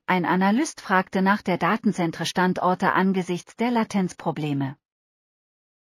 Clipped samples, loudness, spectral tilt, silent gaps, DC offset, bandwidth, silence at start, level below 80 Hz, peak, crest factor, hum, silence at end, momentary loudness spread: under 0.1%; -23 LUFS; -5.5 dB/octave; none; under 0.1%; 15 kHz; 0.1 s; -66 dBFS; -4 dBFS; 18 dB; none; 1.2 s; 7 LU